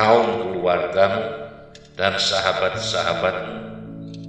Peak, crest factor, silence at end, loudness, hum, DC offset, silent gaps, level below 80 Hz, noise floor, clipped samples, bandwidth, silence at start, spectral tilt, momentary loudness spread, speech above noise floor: -2 dBFS; 20 dB; 0 s; -20 LUFS; none; under 0.1%; none; -52 dBFS; -43 dBFS; under 0.1%; 10.5 kHz; 0 s; -4 dB/octave; 17 LU; 22 dB